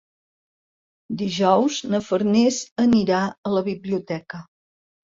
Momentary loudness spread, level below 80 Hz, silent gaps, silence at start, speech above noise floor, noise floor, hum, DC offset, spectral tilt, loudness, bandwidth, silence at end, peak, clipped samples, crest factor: 13 LU; -60 dBFS; 2.71-2.76 s, 3.38-3.43 s; 1.1 s; over 69 dB; under -90 dBFS; none; under 0.1%; -5.5 dB/octave; -21 LUFS; 7.8 kHz; 0.6 s; -4 dBFS; under 0.1%; 18 dB